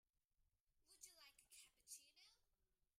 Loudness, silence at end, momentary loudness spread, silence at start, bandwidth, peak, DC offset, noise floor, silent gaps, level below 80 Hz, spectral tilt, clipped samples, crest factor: -64 LUFS; 0.15 s; 6 LU; 0.05 s; 15.5 kHz; -44 dBFS; under 0.1%; -88 dBFS; 0.61-0.67 s; under -90 dBFS; 2 dB/octave; under 0.1%; 26 dB